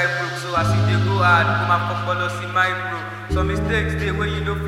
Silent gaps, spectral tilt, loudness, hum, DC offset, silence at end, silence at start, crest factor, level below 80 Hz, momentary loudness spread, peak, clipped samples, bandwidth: none; -6 dB/octave; -20 LUFS; none; under 0.1%; 0 s; 0 s; 18 dB; -32 dBFS; 8 LU; -2 dBFS; under 0.1%; 13 kHz